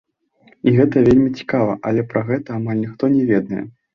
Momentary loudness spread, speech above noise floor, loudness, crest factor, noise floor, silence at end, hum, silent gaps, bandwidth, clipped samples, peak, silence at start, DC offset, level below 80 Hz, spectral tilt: 9 LU; 38 dB; -18 LUFS; 16 dB; -54 dBFS; 0.25 s; none; none; 6.6 kHz; under 0.1%; -2 dBFS; 0.65 s; under 0.1%; -46 dBFS; -9.5 dB/octave